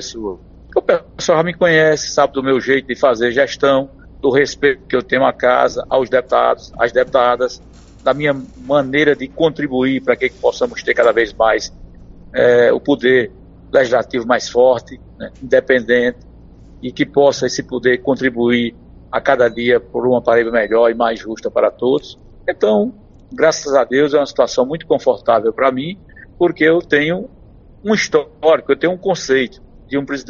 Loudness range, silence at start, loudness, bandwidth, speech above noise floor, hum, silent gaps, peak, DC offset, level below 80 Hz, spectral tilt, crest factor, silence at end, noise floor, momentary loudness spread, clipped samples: 2 LU; 0 s; -15 LUFS; 7.4 kHz; 25 dB; none; none; 0 dBFS; under 0.1%; -44 dBFS; -3.5 dB/octave; 16 dB; 0.05 s; -40 dBFS; 10 LU; under 0.1%